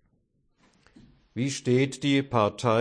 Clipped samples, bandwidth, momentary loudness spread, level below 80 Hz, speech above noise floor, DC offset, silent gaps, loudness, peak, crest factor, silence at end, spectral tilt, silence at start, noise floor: under 0.1%; 10.5 kHz; 8 LU; -62 dBFS; 45 dB; under 0.1%; none; -26 LUFS; -8 dBFS; 18 dB; 0 s; -5.5 dB/octave; 1.35 s; -70 dBFS